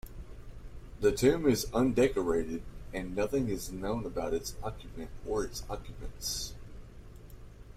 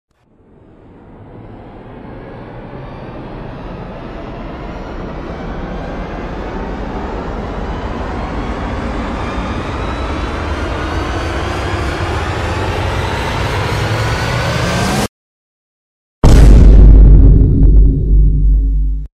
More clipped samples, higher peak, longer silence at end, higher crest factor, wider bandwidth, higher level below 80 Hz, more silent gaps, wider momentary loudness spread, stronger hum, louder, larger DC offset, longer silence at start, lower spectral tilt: second, under 0.1% vs 0.8%; second, -12 dBFS vs 0 dBFS; about the same, 0 s vs 0.1 s; first, 20 dB vs 12 dB; first, 16 kHz vs 11 kHz; second, -46 dBFS vs -14 dBFS; second, none vs 15.09-16.22 s; first, 24 LU vs 21 LU; neither; second, -32 LUFS vs -15 LUFS; neither; second, 0.05 s vs 1.1 s; second, -5 dB/octave vs -6.5 dB/octave